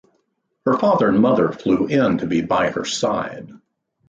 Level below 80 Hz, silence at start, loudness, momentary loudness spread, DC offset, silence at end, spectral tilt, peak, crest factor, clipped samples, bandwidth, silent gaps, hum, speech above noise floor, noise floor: -54 dBFS; 0.65 s; -19 LUFS; 9 LU; under 0.1%; 0.5 s; -5.5 dB/octave; -4 dBFS; 14 dB; under 0.1%; 9.2 kHz; none; none; 51 dB; -69 dBFS